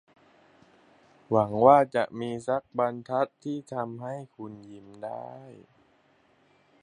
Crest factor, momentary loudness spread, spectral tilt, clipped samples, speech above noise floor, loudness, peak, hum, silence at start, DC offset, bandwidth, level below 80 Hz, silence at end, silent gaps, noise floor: 24 dB; 24 LU; -7.5 dB/octave; under 0.1%; 37 dB; -27 LUFS; -6 dBFS; none; 1.3 s; under 0.1%; 10.5 kHz; -68 dBFS; 1.3 s; none; -64 dBFS